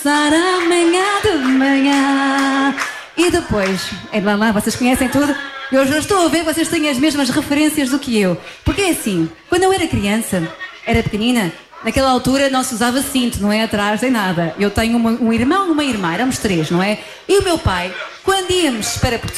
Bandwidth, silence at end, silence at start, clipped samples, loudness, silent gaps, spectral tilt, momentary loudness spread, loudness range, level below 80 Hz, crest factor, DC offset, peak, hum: 15.5 kHz; 0 s; 0 s; under 0.1%; -16 LUFS; none; -4 dB/octave; 6 LU; 2 LU; -36 dBFS; 12 dB; under 0.1%; -4 dBFS; none